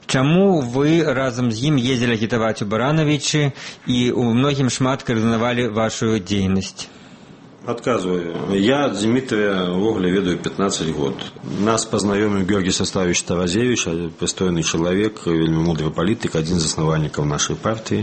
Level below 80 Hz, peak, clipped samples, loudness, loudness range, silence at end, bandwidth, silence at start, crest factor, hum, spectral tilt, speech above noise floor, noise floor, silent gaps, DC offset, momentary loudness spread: -44 dBFS; -2 dBFS; under 0.1%; -19 LUFS; 3 LU; 0 s; 8.8 kHz; 0.1 s; 18 dB; none; -5 dB/octave; 24 dB; -42 dBFS; none; under 0.1%; 6 LU